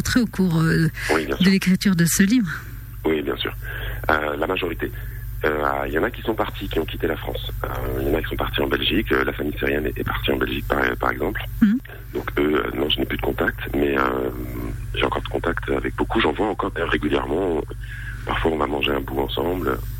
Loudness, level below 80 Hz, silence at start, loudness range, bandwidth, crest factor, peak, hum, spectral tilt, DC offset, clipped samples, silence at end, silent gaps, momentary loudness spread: -22 LUFS; -34 dBFS; 0 s; 4 LU; 16.5 kHz; 18 dB; -4 dBFS; none; -5 dB/octave; under 0.1%; under 0.1%; 0 s; none; 10 LU